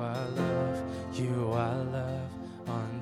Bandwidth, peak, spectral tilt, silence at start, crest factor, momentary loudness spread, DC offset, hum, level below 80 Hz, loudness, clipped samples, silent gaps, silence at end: 13 kHz; -16 dBFS; -7.5 dB/octave; 0 s; 16 dB; 7 LU; under 0.1%; none; -58 dBFS; -33 LUFS; under 0.1%; none; 0 s